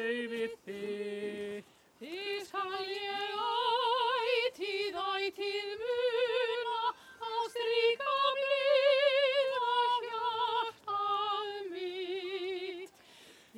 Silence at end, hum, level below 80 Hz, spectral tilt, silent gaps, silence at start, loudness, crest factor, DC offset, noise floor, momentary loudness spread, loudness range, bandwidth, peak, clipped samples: 0 s; none; -80 dBFS; -3 dB/octave; none; 0 s; -33 LUFS; 16 dB; under 0.1%; -58 dBFS; 11 LU; 7 LU; 15.5 kHz; -16 dBFS; under 0.1%